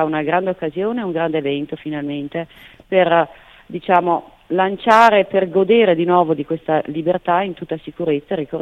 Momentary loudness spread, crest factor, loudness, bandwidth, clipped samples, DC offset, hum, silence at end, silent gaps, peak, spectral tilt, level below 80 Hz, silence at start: 12 LU; 18 dB; -18 LUFS; 12.5 kHz; under 0.1%; under 0.1%; none; 0 s; none; 0 dBFS; -7 dB/octave; -56 dBFS; 0 s